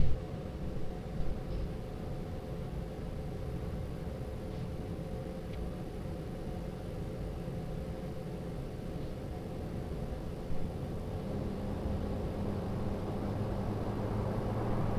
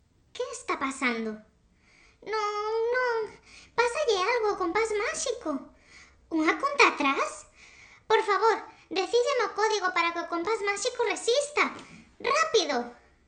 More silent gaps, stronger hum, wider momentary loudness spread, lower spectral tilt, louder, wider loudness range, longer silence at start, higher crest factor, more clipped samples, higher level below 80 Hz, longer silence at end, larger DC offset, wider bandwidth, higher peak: neither; neither; second, 5 LU vs 11 LU; first, -8 dB/octave vs -1.5 dB/octave; second, -39 LUFS vs -27 LUFS; about the same, 4 LU vs 4 LU; second, 0 s vs 0.35 s; about the same, 20 dB vs 22 dB; neither; first, -42 dBFS vs -64 dBFS; second, 0 s vs 0.35 s; neither; first, 16 kHz vs 10 kHz; second, -16 dBFS vs -8 dBFS